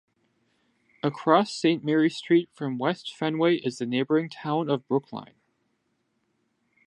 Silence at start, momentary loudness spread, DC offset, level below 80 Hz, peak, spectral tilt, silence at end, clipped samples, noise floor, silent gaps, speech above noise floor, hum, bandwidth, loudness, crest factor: 1.05 s; 9 LU; under 0.1%; -78 dBFS; -4 dBFS; -6 dB/octave; 1.6 s; under 0.1%; -74 dBFS; none; 49 dB; none; 10.5 kHz; -26 LUFS; 22 dB